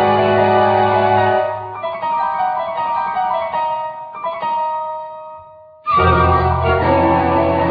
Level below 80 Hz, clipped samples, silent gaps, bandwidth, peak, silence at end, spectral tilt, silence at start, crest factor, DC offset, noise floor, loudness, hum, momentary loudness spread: -34 dBFS; under 0.1%; none; 5 kHz; 0 dBFS; 0 s; -9.5 dB/octave; 0 s; 16 dB; under 0.1%; -40 dBFS; -16 LUFS; none; 13 LU